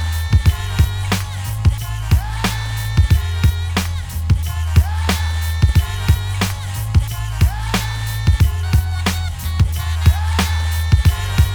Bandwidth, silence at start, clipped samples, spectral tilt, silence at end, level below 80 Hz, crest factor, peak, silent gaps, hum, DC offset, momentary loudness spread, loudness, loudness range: over 20 kHz; 0 s; under 0.1%; -5 dB/octave; 0 s; -20 dBFS; 16 dB; 0 dBFS; none; none; under 0.1%; 5 LU; -18 LUFS; 1 LU